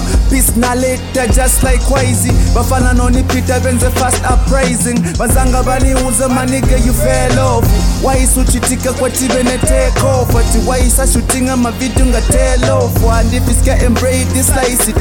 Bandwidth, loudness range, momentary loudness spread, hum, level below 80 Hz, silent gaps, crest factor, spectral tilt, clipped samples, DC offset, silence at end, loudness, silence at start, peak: 17.5 kHz; 0 LU; 2 LU; none; -14 dBFS; none; 10 dB; -4.5 dB/octave; under 0.1%; under 0.1%; 0 s; -12 LUFS; 0 s; 0 dBFS